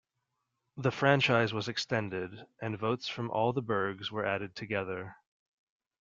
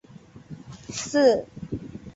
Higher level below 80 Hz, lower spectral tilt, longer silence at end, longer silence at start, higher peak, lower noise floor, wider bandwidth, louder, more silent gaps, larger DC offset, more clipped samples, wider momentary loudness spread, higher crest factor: second, -70 dBFS vs -54 dBFS; about the same, -5.5 dB/octave vs -4.5 dB/octave; first, 0.85 s vs 0.05 s; first, 0.75 s vs 0.35 s; second, -10 dBFS vs -6 dBFS; first, -84 dBFS vs -48 dBFS; about the same, 7.6 kHz vs 8 kHz; second, -32 LUFS vs -25 LUFS; neither; neither; neither; second, 14 LU vs 23 LU; about the same, 24 dB vs 20 dB